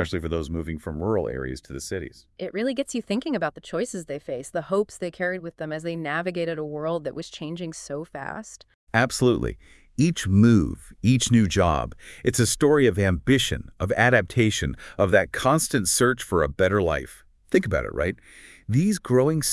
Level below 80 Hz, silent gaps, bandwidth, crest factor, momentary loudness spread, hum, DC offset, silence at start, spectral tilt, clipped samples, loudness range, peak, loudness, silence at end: -44 dBFS; 8.74-8.87 s; 12 kHz; 20 dB; 15 LU; none; under 0.1%; 0 s; -5 dB/octave; under 0.1%; 8 LU; -4 dBFS; -24 LUFS; 0 s